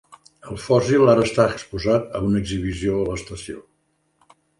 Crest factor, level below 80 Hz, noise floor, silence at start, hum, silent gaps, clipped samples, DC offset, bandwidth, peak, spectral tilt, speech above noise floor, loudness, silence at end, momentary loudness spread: 20 dB; -42 dBFS; -68 dBFS; 0.45 s; none; none; under 0.1%; under 0.1%; 11.5 kHz; -2 dBFS; -6.5 dB/octave; 48 dB; -20 LUFS; 1 s; 19 LU